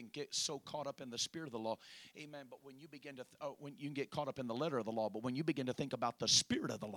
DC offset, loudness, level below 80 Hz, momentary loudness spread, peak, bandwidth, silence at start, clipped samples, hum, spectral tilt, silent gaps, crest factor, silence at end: under 0.1%; -39 LUFS; -76 dBFS; 20 LU; -18 dBFS; 19 kHz; 0 s; under 0.1%; none; -3 dB/octave; none; 22 dB; 0 s